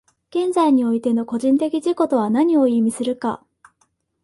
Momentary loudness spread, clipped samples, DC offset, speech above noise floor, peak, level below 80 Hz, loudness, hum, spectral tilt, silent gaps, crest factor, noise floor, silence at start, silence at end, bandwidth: 9 LU; under 0.1%; under 0.1%; 48 dB; -6 dBFS; -64 dBFS; -19 LUFS; none; -6 dB/octave; none; 14 dB; -66 dBFS; 0.35 s; 0.9 s; 11.5 kHz